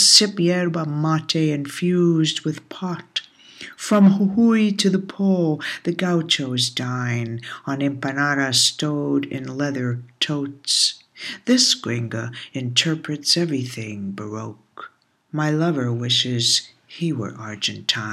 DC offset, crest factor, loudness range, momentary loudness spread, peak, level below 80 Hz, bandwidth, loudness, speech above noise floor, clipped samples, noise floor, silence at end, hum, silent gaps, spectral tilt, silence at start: under 0.1%; 20 dB; 4 LU; 14 LU; -2 dBFS; -68 dBFS; 15.5 kHz; -20 LUFS; 24 dB; under 0.1%; -44 dBFS; 0 s; none; none; -4 dB/octave; 0 s